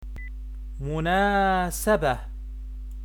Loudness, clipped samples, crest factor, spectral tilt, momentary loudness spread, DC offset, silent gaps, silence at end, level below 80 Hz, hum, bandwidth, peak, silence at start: -24 LUFS; under 0.1%; 16 dB; -5 dB/octave; 18 LU; under 0.1%; none; 0 s; -34 dBFS; none; 19 kHz; -10 dBFS; 0 s